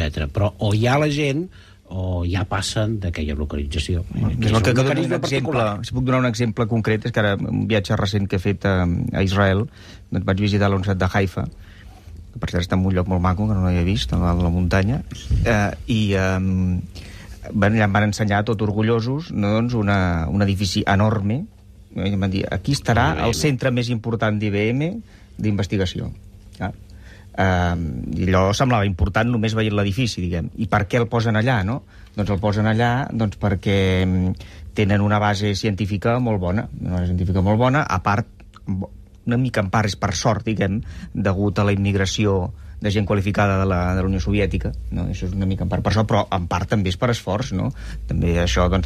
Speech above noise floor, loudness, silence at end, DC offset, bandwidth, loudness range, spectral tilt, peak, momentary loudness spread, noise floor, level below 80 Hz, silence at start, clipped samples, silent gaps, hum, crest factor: 21 dB; -21 LUFS; 0 s; under 0.1%; 13.5 kHz; 2 LU; -6.5 dB/octave; -6 dBFS; 9 LU; -41 dBFS; -34 dBFS; 0 s; under 0.1%; none; none; 16 dB